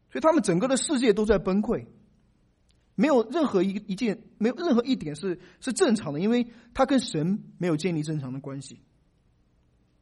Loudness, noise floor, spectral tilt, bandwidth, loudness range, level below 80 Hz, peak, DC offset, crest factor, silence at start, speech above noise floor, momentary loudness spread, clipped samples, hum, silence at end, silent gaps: -26 LUFS; -65 dBFS; -5.5 dB/octave; 11.5 kHz; 3 LU; -52 dBFS; -8 dBFS; under 0.1%; 18 dB; 0.15 s; 40 dB; 11 LU; under 0.1%; none; 1.25 s; none